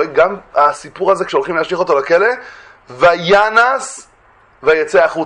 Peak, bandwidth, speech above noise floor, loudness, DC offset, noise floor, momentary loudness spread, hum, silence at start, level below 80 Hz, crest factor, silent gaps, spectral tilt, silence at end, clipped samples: 0 dBFS; 10.5 kHz; 35 dB; -13 LUFS; under 0.1%; -49 dBFS; 9 LU; none; 0 s; -52 dBFS; 14 dB; none; -4 dB/octave; 0 s; under 0.1%